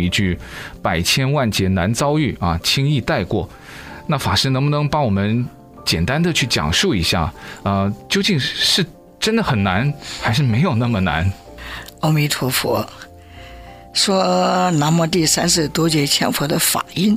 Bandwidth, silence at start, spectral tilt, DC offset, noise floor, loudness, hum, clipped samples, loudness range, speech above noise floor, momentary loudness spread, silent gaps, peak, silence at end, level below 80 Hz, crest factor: 16 kHz; 0 s; -4.5 dB/octave; under 0.1%; -38 dBFS; -17 LUFS; none; under 0.1%; 3 LU; 21 dB; 10 LU; none; -4 dBFS; 0 s; -42 dBFS; 16 dB